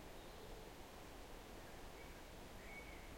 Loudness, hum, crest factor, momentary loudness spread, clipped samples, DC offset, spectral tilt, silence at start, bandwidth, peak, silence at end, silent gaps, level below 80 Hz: -56 LUFS; none; 12 dB; 3 LU; under 0.1%; under 0.1%; -4 dB/octave; 0 s; 16.5 kHz; -42 dBFS; 0 s; none; -60 dBFS